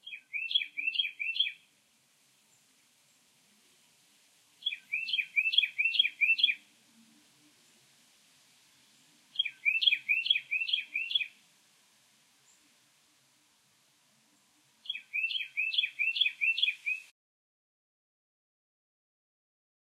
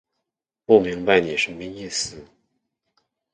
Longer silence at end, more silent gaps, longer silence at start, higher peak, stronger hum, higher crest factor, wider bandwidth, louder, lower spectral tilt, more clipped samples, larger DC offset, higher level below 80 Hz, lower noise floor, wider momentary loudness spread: first, 2.85 s vs 1.1 s; neither; second, 0.05 s vs 0.7 s; second, -12 dBFS vs 0 dBFS; neither; about the same, 24 dB vs 22 dB; first, 15.5 kHz vs 9.6 kHz; second, -29 LUFS vs -21 LUFS; second, 2.5 dB/octave vs -3.5 dB/octave; neither; neither; second, under -90 dBFS vs -56 dBFS; second, -69 dBFS vs -83 dBFS; second, 11 LU vs 14 LU